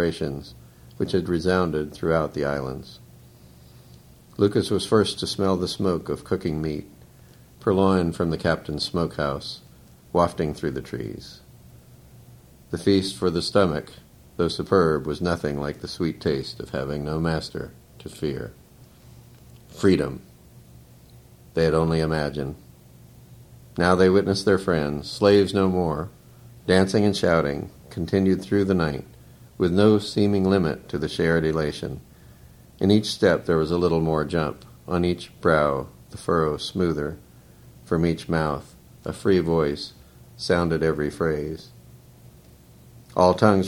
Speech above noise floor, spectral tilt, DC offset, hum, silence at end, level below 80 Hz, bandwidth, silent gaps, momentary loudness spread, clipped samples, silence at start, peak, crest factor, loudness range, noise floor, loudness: 27 dB; -6.5 dB/octave; under 0.1%; none; 0 s; -46 dBFS; 17 kHz; none; 15 LU; under 0.1%; 0 s; -2 dBFS; 22 dB; 6 LU; -50 dBFS; -23 LUFS